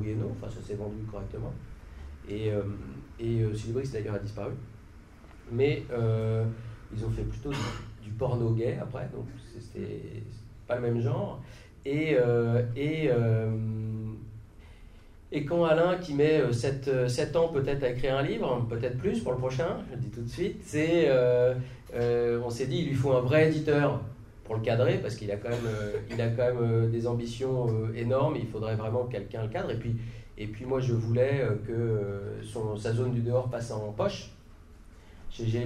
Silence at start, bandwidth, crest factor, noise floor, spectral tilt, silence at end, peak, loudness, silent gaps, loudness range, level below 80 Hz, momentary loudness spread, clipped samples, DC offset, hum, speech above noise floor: 0 s; 11.5 kHz; 18 dB; -51 dBFS; -7.5 dB/octave; 0 s; -12 dBFS; -30 LUFS; none; 7 LU; -48 dBFS; 15 LU; under 0.1%; under 0.1%; none; 22 dB